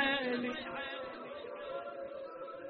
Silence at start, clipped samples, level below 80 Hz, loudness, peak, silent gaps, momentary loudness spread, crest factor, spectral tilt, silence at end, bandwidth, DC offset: 0 s; under 0.1%; -70 dBFS; -40 LUFS; -20 dBFS; none; 11 LU; 18 dB; -0.5 dB/octave; 0 s; 5 kHz; under 0.1%